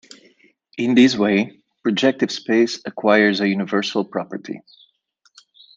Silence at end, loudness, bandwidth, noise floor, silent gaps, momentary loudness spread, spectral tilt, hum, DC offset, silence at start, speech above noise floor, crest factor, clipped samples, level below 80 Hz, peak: 1.2 s; -19 LUFS; 8 kHz; -63 dBFS; none; 15 LU; -5 dB/octave; none; under 0.1%; 0.75 s; 44 dB; 18 dB; under 0.1%; -68 dBFS; -2 dBFS